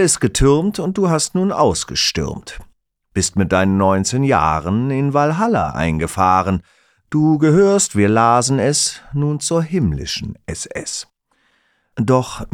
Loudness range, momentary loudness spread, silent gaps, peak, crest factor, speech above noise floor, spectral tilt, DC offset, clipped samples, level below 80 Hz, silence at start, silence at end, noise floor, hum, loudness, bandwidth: 5 LU; 11 LU; none; -2 dBFS; 16 dB; 46 dB; -5 dB/octave; under 0.1%; under 0.1%; -36 dBFS; 0 s; 0.05 s; -62 dBFS; none; -16 LUFS; 16 kHz